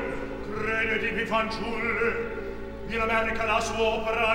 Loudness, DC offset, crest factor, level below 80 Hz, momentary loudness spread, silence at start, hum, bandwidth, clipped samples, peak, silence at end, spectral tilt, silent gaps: -27 LUFS; under 0.1%; 16 dB; -42 dBFS; 9 LU; 0 s; none; 16.5 kHz; under 0.1%; -10 dBFS; 0 s; -4 dB/octave; none